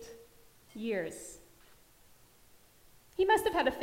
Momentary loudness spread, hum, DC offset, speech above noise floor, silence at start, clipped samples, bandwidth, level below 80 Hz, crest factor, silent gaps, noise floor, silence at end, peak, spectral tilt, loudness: 25 LU; none; under 0.1%; 30 dB; 0 s; under 0.1%; 16 kHz; -62 dBFS; 22 dB; none; -61 dBFS; 0 s; -14 dBFS; -3.5 dB/octave; -32 LUFS